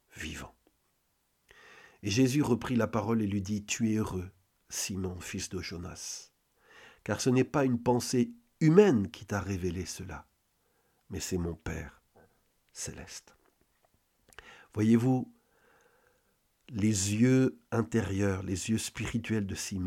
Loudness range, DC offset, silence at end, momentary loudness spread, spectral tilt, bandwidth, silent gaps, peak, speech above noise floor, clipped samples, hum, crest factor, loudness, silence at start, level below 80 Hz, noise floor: 12 LU; under 0.1%; 0 s; 17 LU; -5.5 dB/octave; 16 kHz; none; -8 dBFS; 46 dB; under 0.1%; none; 24 dB; -30 LUFS; 0.15 s; -58 dBFS; -75 dBFS